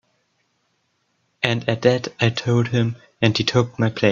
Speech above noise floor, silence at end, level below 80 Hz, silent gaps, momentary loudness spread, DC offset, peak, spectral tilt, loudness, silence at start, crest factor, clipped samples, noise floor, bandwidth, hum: 49 dB; 0 s; -56 dBFS; none; 4 LU; under 0.1%; 0 dBFS; -6 dB/octave; -20 LUFS; 1.4 s; 20 dB; under 0.1%; -69 dBFS; 7.4 kHz; none